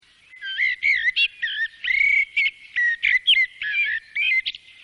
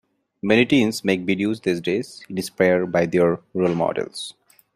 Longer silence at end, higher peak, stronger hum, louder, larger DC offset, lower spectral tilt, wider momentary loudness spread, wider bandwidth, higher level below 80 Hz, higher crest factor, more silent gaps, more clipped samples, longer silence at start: second, 0.25 s vs 0.45 s; second, -10 dBFS vs -4 dBFS; neither; about the same, -19 LUFS vs -21 LUFS; neither; second, 2.5 dB/octave vs -5.5 dB/octave; second, 8 LU vs 12 LU; second, 10.5 kHz vs 15.5 kHz; about the same, -62 dBFS vs -60 dBFS; about the same, 14 dB vs 18 dB; neither; neither; about the same, 0.4 s vs 0.45 s